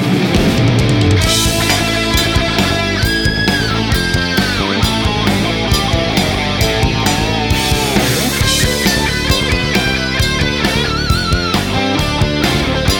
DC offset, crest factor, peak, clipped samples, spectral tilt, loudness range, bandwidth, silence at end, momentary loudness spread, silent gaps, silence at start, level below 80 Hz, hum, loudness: under 0.1%; 12 dB; 0 dBFS; under 0.1%; -4 dB/octave; 1 LU; 17.5 kHz; 0 s; 2 LU; none; 0 s; -24 dBFS; none; -13 LUFS